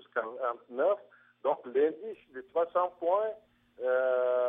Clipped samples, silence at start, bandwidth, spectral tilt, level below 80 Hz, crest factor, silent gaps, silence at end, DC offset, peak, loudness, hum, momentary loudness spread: under 0.1%; 0.15 s; 3.8 kHz; -7.5 dB/octave; -82 dBFS; 16 dB; none; 0 s; under 0.1%; -16 dBFS; -31 LUFS; none; 10 LU